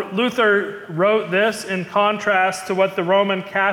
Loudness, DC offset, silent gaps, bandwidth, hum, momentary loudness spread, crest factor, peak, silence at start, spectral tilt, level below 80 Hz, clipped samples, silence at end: -19 LUFS; under 0.1%; none; 17 kHz; none; 4 LU; 14 dB; -6 dBFS; 0 s; -4.5 dB/octave; -66 dBFS; under 0.1%; 0 s